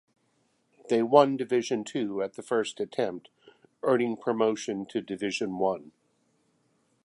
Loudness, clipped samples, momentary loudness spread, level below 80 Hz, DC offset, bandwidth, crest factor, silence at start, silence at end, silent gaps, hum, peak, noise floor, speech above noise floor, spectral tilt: -28 LUFS; under 0.1%; 11 LU; -76 dBFS; under 0.1%; 11.5 kHz; 24 dB; 0.85 s; 1.2 s; none; none; -4 dBFS; -71 dBFS; 44 dB; -5 dB/octave